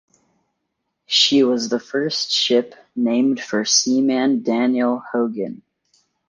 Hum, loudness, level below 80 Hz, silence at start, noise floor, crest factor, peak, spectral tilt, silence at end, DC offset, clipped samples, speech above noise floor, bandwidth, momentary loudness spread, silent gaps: none; -18 LUFS; -70 dBFS; 1.1 s; -75 dBFS; 16 dB; -4 dBFS; -2.5 dB/octave; 0.75 s; under 0.1%; under 0.1%; 57 dB; 10 kHz; 8 LU; none